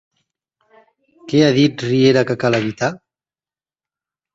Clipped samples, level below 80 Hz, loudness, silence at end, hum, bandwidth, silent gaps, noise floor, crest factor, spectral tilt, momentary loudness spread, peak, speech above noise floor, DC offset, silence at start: under 0.1%; -58 dBFS; -16 LUFS; 1.4 s; none; 7.8 kHz; none; under -90 dBFS; 18 dB; -6 dB/octave; 8 LU; 0 dBFS; over 75 dB; under 0.1%; 1.25 s